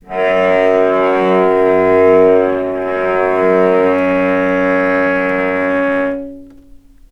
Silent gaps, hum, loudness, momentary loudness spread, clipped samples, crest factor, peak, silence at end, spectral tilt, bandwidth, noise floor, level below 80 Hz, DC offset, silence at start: none; none; -13 LUFS; 7 LU; under 0.1%; 12 dB; 0 dBFS; 0.6 s; -7.5 dB/octave; 6.4 kHz; -40 dBFS; -46 dBFS; under 0.1%; 0.1 s